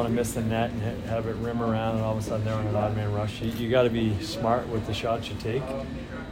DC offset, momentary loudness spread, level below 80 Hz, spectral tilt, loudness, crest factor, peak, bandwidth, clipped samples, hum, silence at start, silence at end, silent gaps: under 0.1%; 6 LU; -44 dBFS; -6.5 dB/octave; -28 LUFS; 18 dB; -10 dBFS; 16 kHz; under 0.1%; none; 0 s; 0 s; none